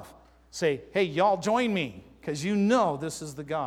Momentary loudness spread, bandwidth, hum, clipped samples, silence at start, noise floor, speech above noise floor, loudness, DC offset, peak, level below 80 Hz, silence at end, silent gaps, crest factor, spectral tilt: 12 LU; 15.5 kHz; none; under 0.1%; 0 s; -53 dBFS; 27 dB; -27 LUFS; under 0.1%; -10 dBFS; -60 dBFS; 0 s; none; 16 dB; -5 dB/octave